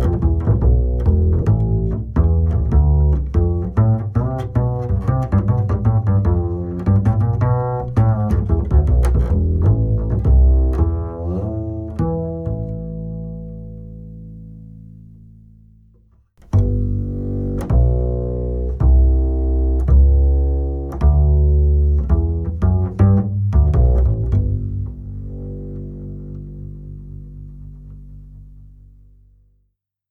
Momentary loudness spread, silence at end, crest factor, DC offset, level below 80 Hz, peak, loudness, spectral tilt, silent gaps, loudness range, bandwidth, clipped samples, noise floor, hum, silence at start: 18 LU; 1.45 s; 14 dB; under 0.1%; -20 dBFS; -2 dBFS; -18 LUFS; -11 dB/octave; none; 16 LU; 2.4 kHz; under 0.1%; -68 dBFS; none; 0 s